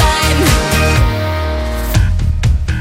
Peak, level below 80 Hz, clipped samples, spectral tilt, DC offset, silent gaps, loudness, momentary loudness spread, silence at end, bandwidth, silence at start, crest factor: 0 dBFS; -16 dBFS; under 0.1%; -4.5 dB/octave; under 0.1%; none; -14 LUFS; 6 LU; 0 s; 16.5 kHz; 0 s; 12 dB